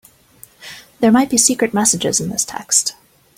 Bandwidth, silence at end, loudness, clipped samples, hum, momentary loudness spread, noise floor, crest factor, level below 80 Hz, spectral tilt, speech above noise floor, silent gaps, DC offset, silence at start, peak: 16.5 kHz; 0.45 s; -15 LUFS; under 0.1%; none; 18 LU; -46 dBFS; 18 dB; -54 dBFS; -2.5 dB/octave; 31 dB; none; under 0.1%; 0.6 s; 0 dBFS